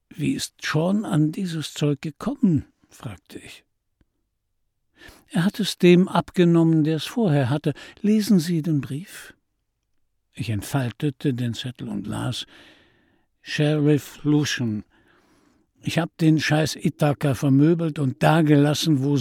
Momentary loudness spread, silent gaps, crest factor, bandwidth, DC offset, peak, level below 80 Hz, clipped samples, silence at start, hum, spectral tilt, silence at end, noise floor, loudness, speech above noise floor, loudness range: 14 LU; none; 18 dB; 16 kHz; under 0.1%; -4 dBFS; -58 dBFS; under 0.1%; 0.15 s; none; -6.5 dB/octave; 0 s; -74 dBFS; -22 LUFS; 53 dB; 9 LU